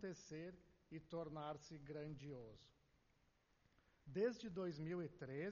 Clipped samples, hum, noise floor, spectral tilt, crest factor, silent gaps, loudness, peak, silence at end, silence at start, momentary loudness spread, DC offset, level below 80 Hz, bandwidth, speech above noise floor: under 0.1%; none; -80 dBFS; -6 dB/octave; 20 dB; none; -50 LUFS; -30 dBFS; 0 s; 0 s; 15 LU; under 0.1%; -76 dBFS; 7 kHz; 30 dB